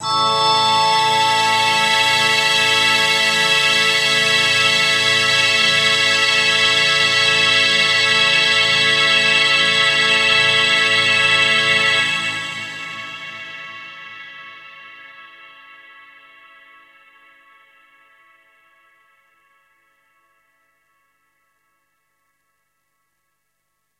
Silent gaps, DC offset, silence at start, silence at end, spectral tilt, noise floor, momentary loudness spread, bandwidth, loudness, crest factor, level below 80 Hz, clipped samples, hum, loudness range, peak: none; under 0.1%; 0 s; 8.75 s; -0.5 dB/octave; -72 dBFS; 16 LU; 16 kHz; -13 LUFS; 16 dB; -70 dBFS; under 0.1%; 50 Hz at -80 dBFS; 14 LU; -2 dBFS